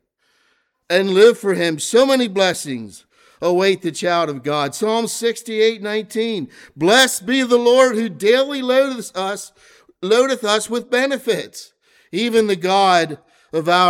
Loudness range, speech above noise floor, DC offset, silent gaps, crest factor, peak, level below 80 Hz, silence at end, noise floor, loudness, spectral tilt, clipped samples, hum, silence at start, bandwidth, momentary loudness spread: 4 LU; 47 dB; under 0.1%; none; 16 dB; -2 dBFS; -66 dBFS; 0 s; -64 dBFS; -17 LUFS; -3.5 dB/octave; under 0.1%; none; 0.9 s; 18 kHz; 13 LU